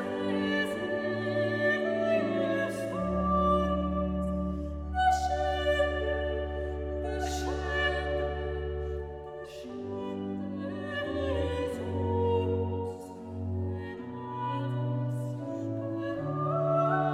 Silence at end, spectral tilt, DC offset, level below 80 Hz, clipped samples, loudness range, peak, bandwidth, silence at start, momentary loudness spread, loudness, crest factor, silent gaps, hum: 0 s; -6.5 dB/octave; under 0.1%; -42 dBFS; under 0.1%; 6 LU; -14 dBFS; 13.5 kHz; 0 s; 10 LU; -31 LUFS; 16 dB; none; none